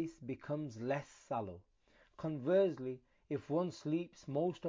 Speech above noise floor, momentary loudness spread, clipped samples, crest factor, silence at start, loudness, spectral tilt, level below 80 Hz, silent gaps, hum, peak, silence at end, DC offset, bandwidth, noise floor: 25 dB; 13 LU; under 0.1%; 18 dB; 0 s; -39 LUFS; -7.5 dB/octave; -72 dBFS; none; none; -22 dBFS; 0 s; under 0.1%; 7.6 kHz; -63 dBFS